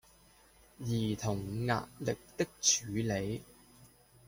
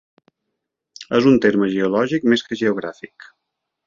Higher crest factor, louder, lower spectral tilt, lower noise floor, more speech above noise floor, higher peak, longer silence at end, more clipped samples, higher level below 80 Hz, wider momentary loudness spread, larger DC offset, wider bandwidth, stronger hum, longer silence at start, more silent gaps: about the same, 22 dB vs 18 dB; second, -34 LUFS vs -18 LUFS; second, -3.5 dB/octave vs -6 dB/octave; second, -63 dBFS vs -79 dBFS; second, 28 dB vs 61 dB; second, -14 dBFS vs -2 dBFS; second, 0.4 s vs 0.8 s; neither; about the same, -60 dBFS vs -60 dBFS; second, 10 LU vs 22 LU; neither; first, 16.5 kHz vs 7.4 kHz; neither; second, 0.8 s vs 1 s; neither